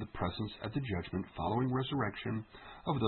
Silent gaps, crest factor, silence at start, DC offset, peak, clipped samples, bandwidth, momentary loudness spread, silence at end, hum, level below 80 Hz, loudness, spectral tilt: none; 18 dB; 0 s; under 0.1%; -18 dBFS; under 0.1%; 4.3 kHz; 8 LU; 0 s; none; -58 dBFS; -37 LUFS; -5.5 dB/octave